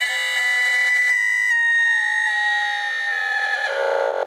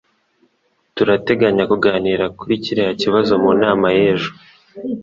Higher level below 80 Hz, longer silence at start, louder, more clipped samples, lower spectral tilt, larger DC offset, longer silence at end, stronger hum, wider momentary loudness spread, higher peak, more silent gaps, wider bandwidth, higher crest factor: second, -90 dBFS vs -50 dBFS; second, 0 s vs 0.95 s; about the same, -18 LUFS vs -16 LUFS; neither; second, 4 dB/octave vs -6.5 dB/octave; neither; about the same, 0 s vs 0 s; neither; second, 5 LU vs 9 LU; second, -8 dBFS vs 0 dBFS; neither; first, 16 kHz vs 7.4 kHz; about the same, 12 dB vs 16 dB